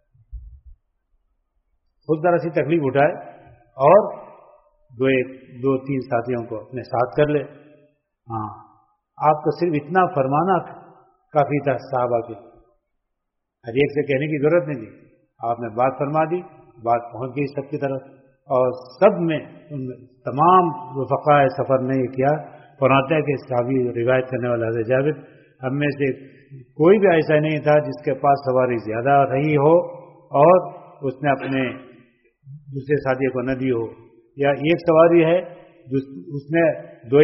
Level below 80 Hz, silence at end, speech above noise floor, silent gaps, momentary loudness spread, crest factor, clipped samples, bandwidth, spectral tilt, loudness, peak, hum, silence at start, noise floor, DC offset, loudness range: -54 dBFS; 0 s; 59 dB; none; 16 LU; 18 dB; under 0.1%; 5.8 kHz; -6 dB/octave; -20 LUFS; -2 dBFS; none; 0.3 s; -78 dBFS; under 0.1%; 6 LU